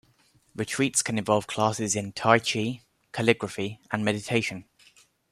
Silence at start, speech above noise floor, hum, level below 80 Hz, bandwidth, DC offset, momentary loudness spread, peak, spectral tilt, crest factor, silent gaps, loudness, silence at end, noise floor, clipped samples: 0.55 s; 37 dB; none; -64 dBFS; 14.5 kHz; under 0.1%; 12 LU; -4 dBFS; -4 dB/octave; 24 dB; none; -26 LUFS; 0.7 s; -63 dBFS; under 0.1%